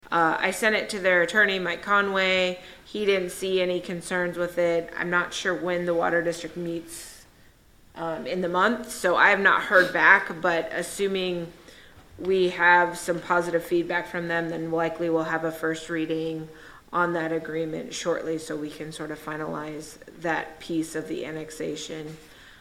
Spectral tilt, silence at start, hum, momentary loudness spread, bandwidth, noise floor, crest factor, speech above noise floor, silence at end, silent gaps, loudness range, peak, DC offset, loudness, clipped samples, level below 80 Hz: -4 dB/octave; 0.05 s; none; 15 LU; 16.5 kHz; -55 dBFS; 24 dB; 30 dB; 0.1 s; none; 10 LU; -2 dBFS; under 0.1%; -25 LUFS; under 0.1%; -58 dBFS